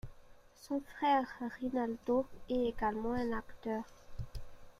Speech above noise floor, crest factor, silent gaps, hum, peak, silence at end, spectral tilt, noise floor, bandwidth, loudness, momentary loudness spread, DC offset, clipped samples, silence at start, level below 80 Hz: 22 dB; 18 dB; none; none; -20 dBFS; 0.1 s; -6.5 dB/octave; -58 dBFS; 14.5 kHz; -36 LUFS; 17 LU; under 0.1%; under 0.1%; 0.05 s; -54 dBFS